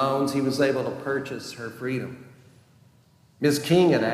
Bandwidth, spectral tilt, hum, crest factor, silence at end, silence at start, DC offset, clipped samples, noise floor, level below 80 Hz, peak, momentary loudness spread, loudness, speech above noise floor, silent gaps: 15.5 kHz; -5.5 dB/octave; none; 18 dB; 0 s; 0 s; under 0.1%; under 0.1%; -58 dBFS; -68 dBFS; -8 dBFS; 15 LU; -25 LUFS; 34 dB; none